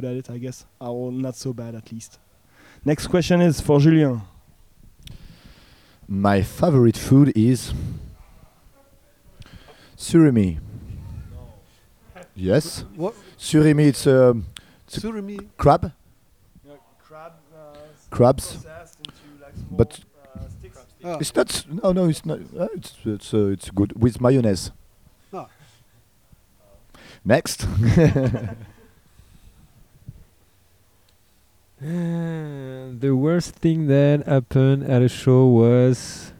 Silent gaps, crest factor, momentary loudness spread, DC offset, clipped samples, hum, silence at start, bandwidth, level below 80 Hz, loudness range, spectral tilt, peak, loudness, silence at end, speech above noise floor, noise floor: none; 20 dB; 22 LU; under 0.1%; under 0.1%; none; 0 s; 15.5 kHz; -44 dBFS; 8 LU; -7 dB/octave; -2 dBFS; -20 LUFS; 0.1 s; 40 dB; -60 dBFS